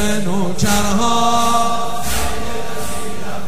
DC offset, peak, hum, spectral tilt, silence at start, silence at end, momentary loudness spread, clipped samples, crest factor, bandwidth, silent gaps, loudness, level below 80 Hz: 20%; -2 dBFS; none; -4 dB/octave; 0 s; 0 s; 10 LU; under 0.1%; 16 dB; 16 kHz; none; -18 LUFS; -34 dBFS